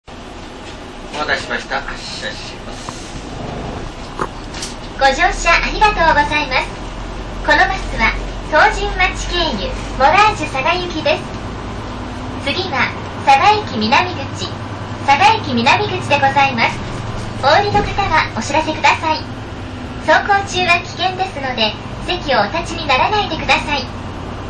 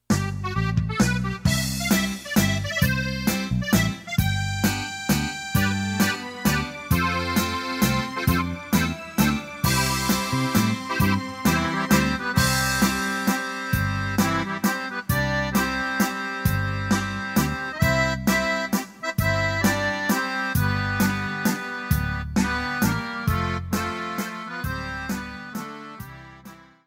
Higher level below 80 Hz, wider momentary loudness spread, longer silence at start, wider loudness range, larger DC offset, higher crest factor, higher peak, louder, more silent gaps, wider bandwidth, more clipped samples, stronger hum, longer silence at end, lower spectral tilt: first, -30 dBFS vs -38 dBFS; first, 16 LU vs 7 LU; about the same, 0.1 s vs 0.1 s; first, 8 LU vs 3 LU; first, 0.2% vs under 0.1%; about the same, 14 dB vs 18 dB; first, -2 dBFS vs -6 dBFS; first, -15 LUFS vs -24 LUFS; neither; second, 11 kHz vs 16.5 kHz; neither; neither; second, 0 s vs 0.3 s; about the same, -4 dB/octave vs -4.5 dB/octave